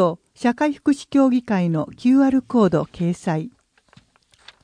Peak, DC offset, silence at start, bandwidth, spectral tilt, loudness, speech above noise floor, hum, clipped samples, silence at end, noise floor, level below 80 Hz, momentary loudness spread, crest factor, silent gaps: -6 dBFS; under 0.1%; 0 s; 10 kHz; -7.5 dB/octave; -20 LUFS; 38 dB; none; under 0.1%; 1.15 s; -57 dBFS; -56 dBFS; 8 LU; 14 dB; none